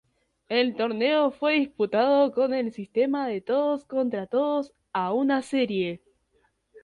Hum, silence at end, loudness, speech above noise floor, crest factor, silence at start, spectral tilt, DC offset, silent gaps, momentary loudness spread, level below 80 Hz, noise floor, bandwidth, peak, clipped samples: none; 0.05 s; -25 LUFS; 44 dB; 16 dB; 0.5 s; -6 dB/octave; under 0.1%; none; 8 LU; -70 dBFS; -69 dBFS; 11 kHz; -10 dBFS; under 0.1%